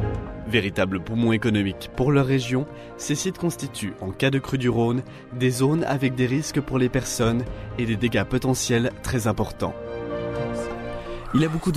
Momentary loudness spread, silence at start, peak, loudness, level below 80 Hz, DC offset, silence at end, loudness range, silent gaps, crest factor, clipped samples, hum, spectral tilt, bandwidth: 9 LU; 0 s; -6 dBFS; -24 LUFS; -42 dBFS; under 0.1%; 0 s; 2 LU; none; 18 dB; under 0.1%; none; -5.5 dB/octave; 15 kHz